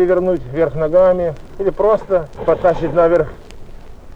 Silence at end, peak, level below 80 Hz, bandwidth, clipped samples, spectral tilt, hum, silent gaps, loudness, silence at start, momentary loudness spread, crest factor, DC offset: 0 s; -2 dBFS; -34 dBFS; 7.2 kHz; under 0.1%; -8.5 dB/octave; none; none; -16 LUFS; 0 s; 8 LU; 14 dB; under 0.1%